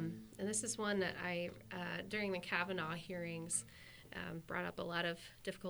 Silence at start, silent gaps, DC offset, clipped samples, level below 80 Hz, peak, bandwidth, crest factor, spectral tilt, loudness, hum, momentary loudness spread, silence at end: 0 s; none; under 0.1%; under 0.1%; -70 dBFS; -22 dBFS; over 20 kHz; 22 dB; -3.5 dB/octave; -41 LUFS; none; 9 LU; 0 s